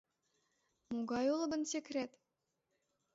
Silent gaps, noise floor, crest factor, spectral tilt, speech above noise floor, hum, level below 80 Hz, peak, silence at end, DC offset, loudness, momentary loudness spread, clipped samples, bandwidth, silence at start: none; -86 dBFS; 16 dB; -3.5 dB/octave; 48 dB; none; -80 dBFS; -24 dBFS; 1.05 s; under 0.1%; -39 LUFS; 9 LU; under 0.1%; 7.6 kHz; 0.9 s